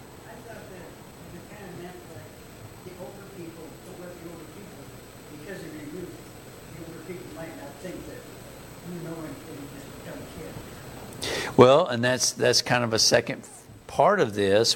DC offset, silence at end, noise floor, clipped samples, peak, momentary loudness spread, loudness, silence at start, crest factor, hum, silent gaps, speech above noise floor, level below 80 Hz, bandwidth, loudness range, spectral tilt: under 0.1%; 0 s; -45 dBFS; under 0.1%; -2 dBFS; 23 LU; -22 LUFS; 0 s; 26 dB; none; none; 24 dB; -56 dBFS; 17 kHz; 20 LU; -3.5 dB/octave